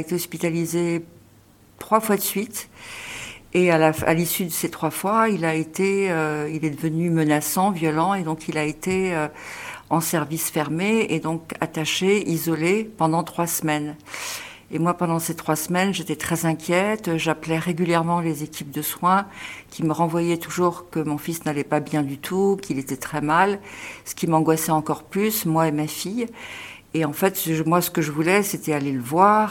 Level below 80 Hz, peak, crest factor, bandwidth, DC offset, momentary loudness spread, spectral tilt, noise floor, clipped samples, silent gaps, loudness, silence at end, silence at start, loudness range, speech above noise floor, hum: -56 dBFS; -2 dBFS; 20 dB; 18 kHz; under 0.1%; 11 LU; -5 dB/octave; -53 dBFS; under 0.1%; none; -23 LUFS; 0 s; 0 s; 2 LU; 30 dB; none